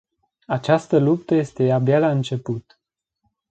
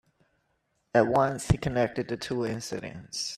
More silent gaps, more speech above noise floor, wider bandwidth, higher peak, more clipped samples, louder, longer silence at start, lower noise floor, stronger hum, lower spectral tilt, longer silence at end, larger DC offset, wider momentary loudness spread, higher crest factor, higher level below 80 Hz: neither; first, 57 dB vs 47 dB; second, 8.8 kHz vs 14.5 kHz; first, -2 dBFS vs -8 dBFS; neither; first, -20 LUFS vs -28 LUFS; second, 0.5 s vs 0.95 s; about the same, -76 dBFS vs -75 dBFS; neither; first, -8 dB/octave vs -5.5 dB/octave; first, 0.9 s vs 0 s; neither; about the same, 10 LU vs 12 LU; about the same, 18 dB vs 20 dB; second, -62 dBFS vs -48 dBFS